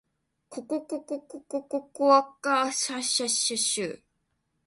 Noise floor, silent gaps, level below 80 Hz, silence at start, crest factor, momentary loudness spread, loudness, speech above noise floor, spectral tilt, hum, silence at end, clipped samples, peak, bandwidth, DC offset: -76 dBFS; none; -76 dBFS; 0.5 s; 22 dB; 16 LU; -26 LUFS; 49 dB; -1 dB/octave; none; 0.7 s; under 0.1%; -8 dBFS; 11.5 kHz; under 0.1%